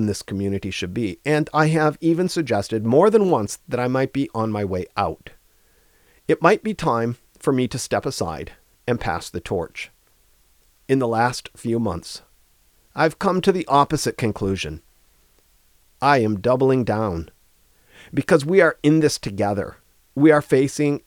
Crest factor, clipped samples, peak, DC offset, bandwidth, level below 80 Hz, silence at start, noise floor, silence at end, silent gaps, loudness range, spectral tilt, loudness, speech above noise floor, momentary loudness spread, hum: 20 dB; under 0.1%; 0 dBFS; under 0.1%; 19 kHz; -48 dBFS; 0 s; -58 dBFS; 0.1 s; none; 6 LU; -6 dB/octave; -21 LUFS; 38 dB; 14 LU; none